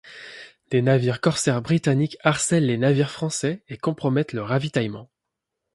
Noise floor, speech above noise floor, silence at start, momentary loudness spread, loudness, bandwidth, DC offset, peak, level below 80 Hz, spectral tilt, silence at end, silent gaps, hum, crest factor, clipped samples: -83 dBFS; 61 dB; 0.05 s; 11 LU; -22 LUFS; 11.5 kHz; under 0.1%; -4 dBFS; -60 dBFS; -5.5 dB/octave; 0.7 s; none; none; 20 dB; under 0.1%